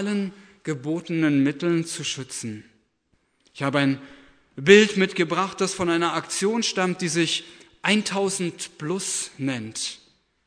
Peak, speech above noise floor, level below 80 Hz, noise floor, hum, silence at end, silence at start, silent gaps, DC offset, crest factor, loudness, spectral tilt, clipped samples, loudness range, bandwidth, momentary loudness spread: -2 dBFS; 45 dB; -64 dBFS; -69 dBFS; none; 0.5 s; 0 s; none; under 0.1%; 22 dB; -23 LUFS; -4 dB/octave; under 0.1%; 6 LU; 11 kHz; 11 LU